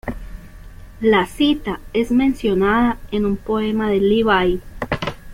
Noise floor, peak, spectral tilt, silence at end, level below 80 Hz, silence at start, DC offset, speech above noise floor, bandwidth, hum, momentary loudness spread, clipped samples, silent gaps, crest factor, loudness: -38 dBFS; -4 dBFS; -6.5 dB/octave; 0 s; -36 dBFS; 0.05 s; under 0.1%; 20 dB; 16 kHz; none; 9 LU; under 0.1%; none; 16 dB; -18 LUFS